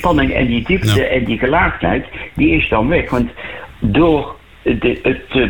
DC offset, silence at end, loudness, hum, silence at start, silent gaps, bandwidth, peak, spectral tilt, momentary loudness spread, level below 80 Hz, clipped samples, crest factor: 0.8%; 0 s; -15 LUFS; none; 0 s; none; 18.5 kHz; -4 dBFS; -6.5 dB/octave; 9 LU; -28 dBFS; under 0.1%; 12 dB